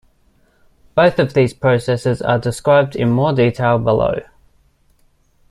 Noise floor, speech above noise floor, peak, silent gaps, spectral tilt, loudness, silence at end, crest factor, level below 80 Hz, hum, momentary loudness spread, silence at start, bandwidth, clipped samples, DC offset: -56 dBFS; 41 dB; 0 dBFS; none; -7 dB/octave; -16 LUFS; 1.3 s; 16 dB; -44 dBFS; none; 5 LU; 0.95 s; 12 kHz; under 0.1%; under 0.1%